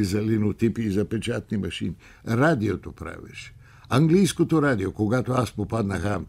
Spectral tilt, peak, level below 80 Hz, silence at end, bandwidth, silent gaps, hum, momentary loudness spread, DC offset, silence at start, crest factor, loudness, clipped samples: -6.5 dB/octave; -6 dBFS; -48 dBFS; 0 s; 15.5 kHz; none; none; 17 LU; under 0.1%; 0 s; 18 dB; -24 LUFS; under 0.1%